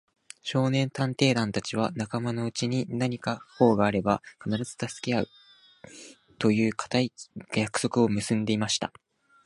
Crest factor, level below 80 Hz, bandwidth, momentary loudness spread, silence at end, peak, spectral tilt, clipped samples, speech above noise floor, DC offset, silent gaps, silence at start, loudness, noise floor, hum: 22 dB; -60 dBFS; 11.5 kHz; 9 LU; 0.55 s; -6 dBFS; -5.5 dB/octave; under 0.1%; 26 dB; under 0.1%; none; 0.45 s; -27 LUFS; -52 dBFS; none